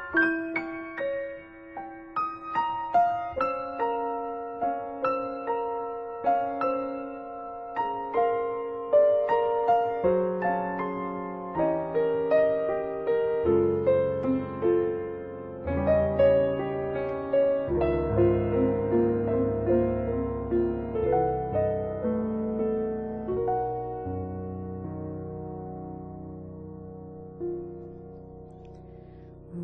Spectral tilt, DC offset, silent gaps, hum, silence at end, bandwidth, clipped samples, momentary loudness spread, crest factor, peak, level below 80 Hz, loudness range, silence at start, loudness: -7 dB/octave; under 0.1%; none; none; 0 s; 5.4 kHz; under 0.1%; 17 LU; 16 dB; -10 dBFS; -48 dBFS; 12 LU; 0 s; -27 LUFS